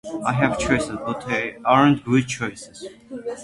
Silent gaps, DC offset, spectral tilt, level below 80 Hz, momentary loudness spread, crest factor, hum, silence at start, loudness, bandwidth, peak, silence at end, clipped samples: none; under 0.1%; -5.5 dB/octave; -46 dBFS; 20 LU; 20 dB; none; 0.05 s; -21 LUFS; 11.5 kHz; -2 dBFS; 0 s; under 0.1%